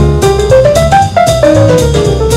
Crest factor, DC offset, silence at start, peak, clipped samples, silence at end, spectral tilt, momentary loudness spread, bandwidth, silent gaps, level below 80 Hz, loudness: 6 dB; under 0.1%; 0 s; 0 dBFS; 2%; 0 s; -5.5 dB/octave; 3 LU; 16 kHz; none; -18 dBFS; -7 LUFS